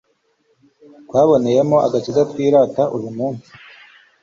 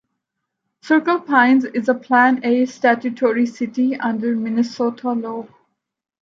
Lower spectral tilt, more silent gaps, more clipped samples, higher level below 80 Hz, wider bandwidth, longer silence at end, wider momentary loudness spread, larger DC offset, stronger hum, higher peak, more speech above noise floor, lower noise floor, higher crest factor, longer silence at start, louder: first, -7.5 dB/octave vs -5.5 dB/octave; neither; neither; first, -58 dBFS vs -74 dBFS; about the same, 7.6 kHz vs 7.4 kHz; about the same, 0.85 s vs 0.9 s; first, 11 LU vs 8 LU; neither; neither; about the same, -2 dBFS vs -2 dBFS; second, 47 dB vs 61 dB; second, -63 dBFS vs -78 dBFS; about the same, 16 dB vs 18 dB; first, 1.1 s vs 0.85 s; about the same, -16 LUFS vs -18 LUFS